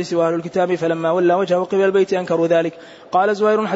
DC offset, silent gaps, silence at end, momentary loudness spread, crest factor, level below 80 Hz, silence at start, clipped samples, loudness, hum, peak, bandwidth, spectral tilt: under 0.1%; none; 0 s; 4 LU; 12 dB; -66 dBFS; 0 s; under 0.1%; -18 LUFS; none; -6 dBFS; 8 kHz; -6.5 dB/octave